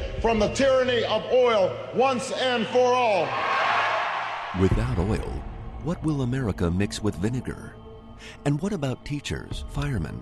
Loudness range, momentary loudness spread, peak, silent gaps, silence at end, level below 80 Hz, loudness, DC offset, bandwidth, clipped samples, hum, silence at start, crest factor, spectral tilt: 7 LU; 13 LU; -8 dBFS; none; 0 s; -38 dBFS; -25 LUFS; under 0.1%; 12.5 kHz; under 0.1%; none; 0 s; 16 dB; -5.5 dB/octave